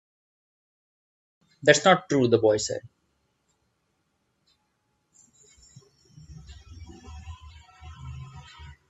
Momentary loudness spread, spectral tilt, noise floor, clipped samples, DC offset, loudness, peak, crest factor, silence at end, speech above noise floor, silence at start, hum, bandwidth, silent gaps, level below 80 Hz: 28 LU; -4 dB/octave; -74 dBFS; under 0.1%; under 0.1%; -22 LUFS; -2 dBFS; 28 dB; 0.2 s; 53 dB; 1.65 s; none; 8.4 kHz; none; -54 dBFS